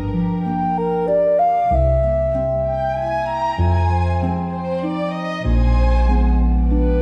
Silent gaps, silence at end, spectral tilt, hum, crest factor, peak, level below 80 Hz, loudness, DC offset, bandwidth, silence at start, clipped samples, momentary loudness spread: none; 0 s; -9 dB/octave; none; 12 dB; -6 dBFS; -20 dBFS; -19 LUFS; under 0.1%; 6 kHz; 0 s; under 0.1%; 6 LU